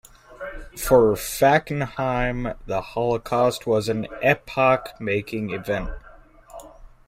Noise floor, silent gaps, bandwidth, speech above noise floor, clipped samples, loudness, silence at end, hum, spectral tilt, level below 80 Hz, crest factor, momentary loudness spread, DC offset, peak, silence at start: -47 dBFS; none; 16 kHz; 25 dB; under 0.1%; -22 LUFS; 0.2 s; none; -5.5 dB/octave; -40 dBFS; 20 dB; 18 LU; under 0.1%; -4 dBFS; 0.3 s